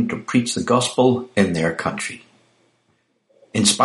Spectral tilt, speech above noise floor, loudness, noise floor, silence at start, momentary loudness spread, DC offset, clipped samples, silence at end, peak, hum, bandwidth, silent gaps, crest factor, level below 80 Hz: -4 dB/octave; 47 dB; -20 LUFS; -66 dBFS; 0 s; 10 LU; under 0.1%; under 0.1%; 0 s; -2 dBFS; none; 11.5 kHz; none; 20 dB; -56 dBFS